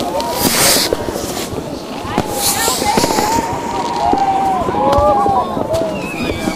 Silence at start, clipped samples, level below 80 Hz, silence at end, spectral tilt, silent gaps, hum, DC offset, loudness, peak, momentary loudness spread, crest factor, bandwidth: 0 s; under 0.1%; -34 dBFS; 0 s; -3 dB/octave; none; none; under 0.1%; -15 LUFS; 0 dBFS; 10 LU; 16 dB; 16 kHz